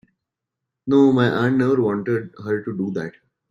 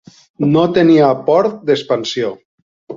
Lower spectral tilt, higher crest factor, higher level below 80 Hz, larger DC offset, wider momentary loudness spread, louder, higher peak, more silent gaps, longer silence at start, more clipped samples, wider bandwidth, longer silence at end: first, -8 dB/octave vs -6.5 dB/octave; about the same, 16 dB vs 14 dB; about the same, -60 dBFS vs -56 dBFS; neither; about the same, 12 LU vs 10 LU; second, -20 LUFS vs -14 LUFS; second, -4 dBFS vs 0 dBFS; second, none vs 2.45-2.87 s; first, 0.85 s vs 0.4 s; neither; about the same, 7.4 kHz vs 7.6 kHz; first, 0.4 s vs 0 s